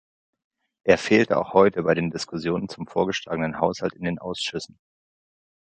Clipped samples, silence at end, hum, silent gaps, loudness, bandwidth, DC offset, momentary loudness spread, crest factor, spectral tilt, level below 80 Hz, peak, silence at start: under 0.1%; 1.05 s; none; none; -23 LUFS; 9.2 kHz; under 0.1%; 11 LU; 22 dB; -5.5 dB/octave; -56 dBFS; -2 dBFS; 0.85 s